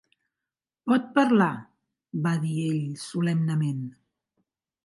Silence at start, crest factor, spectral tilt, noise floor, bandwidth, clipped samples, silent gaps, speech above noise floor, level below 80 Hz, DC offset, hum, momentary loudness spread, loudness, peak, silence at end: 0.85 s; 20 dB; -7 dB/octave; -89 dBFS; 11.5 kHz; under 0.1%; none; 65 dB; -74 dBFS; under 0.1%; none; 15 LU; -26 LUFS; -8 dBFS; 0.95 s